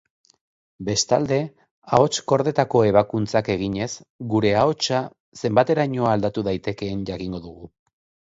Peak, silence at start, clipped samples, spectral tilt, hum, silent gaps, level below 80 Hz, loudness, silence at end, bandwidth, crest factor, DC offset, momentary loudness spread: -2 dBFS; 0.8 s; under 0.1%; -5 dB/octave; none; 1.71-1.82 s, 4.10-4.19 s, 5.20-5.32 s; -52 dBFS; -22 LUFS; 0.7 s; 8 kHz; 22 dB; under 0.1%; 12 LU